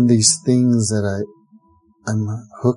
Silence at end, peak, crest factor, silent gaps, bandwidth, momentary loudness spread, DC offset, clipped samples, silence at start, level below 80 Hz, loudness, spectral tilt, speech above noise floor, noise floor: 0 s; -2 dBFS; 18 dB; none; 11.5 kHz; 14 LU; under 0.1%; under 0.1%; 0 s; -48 dBFS; -18 LUFS; -5 dB/octave; 37 dB; -54 dBFS